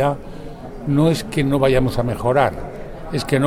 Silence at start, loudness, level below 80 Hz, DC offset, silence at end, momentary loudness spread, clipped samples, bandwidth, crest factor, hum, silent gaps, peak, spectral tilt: 0 s; -19 LUFS; -34 dBFS; under 0.1%; 0 s; 17 LU; under 0.1%; 16 kHz; 18 dB; none; none; -2 dBFS; -6.5 dB/octave